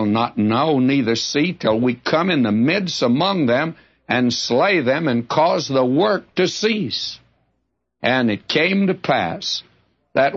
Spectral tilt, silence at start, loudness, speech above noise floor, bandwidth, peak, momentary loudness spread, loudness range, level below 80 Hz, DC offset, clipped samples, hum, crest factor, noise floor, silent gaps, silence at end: -5 dB/octave; 0 s; -18 LUFS; 54 dB; 8 kHz; -4 dBFS; 7 LU; 3 LU; -60 dBFS; under 0.1%; under 0.1%; none; 16 dB; -72 dBFS; none; 0 s